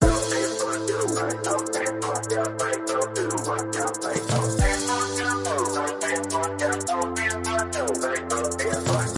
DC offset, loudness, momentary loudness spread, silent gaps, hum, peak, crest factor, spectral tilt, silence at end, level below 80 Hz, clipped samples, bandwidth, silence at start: under 0.1%; -25 LUFS; 3 LU; none; none; -6 dBFS; 20 dB; -4 dB/octave; 0 s; -38 dBFS; under 0.1%; 11.5 kHz; 0 s